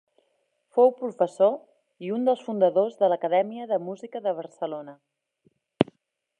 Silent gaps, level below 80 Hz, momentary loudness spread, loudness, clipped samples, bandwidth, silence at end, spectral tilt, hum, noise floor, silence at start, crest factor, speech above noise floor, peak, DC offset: none; -72 dBFS; 13 LU; -25 LUFS; under 0.1%; 9.6 kHz; 0.55 s; -7.5 dB/octave; none; -73 dBFS; 0.75 s; 24 dB; 48 dB; -2 dBFS; under 0.1%